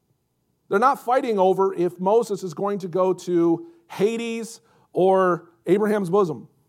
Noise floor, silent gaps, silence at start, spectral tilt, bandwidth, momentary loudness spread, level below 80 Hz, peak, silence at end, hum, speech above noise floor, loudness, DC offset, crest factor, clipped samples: -71 dBFS; none; 0.7 s; -6.5 dB/octave; 15.5 kHz; 9 LU; -78 dBFS; -6 dBFS; 0.25 s; none; 50 dB; -22 LUFS; under 0.1%; 16 dB; under 0.1%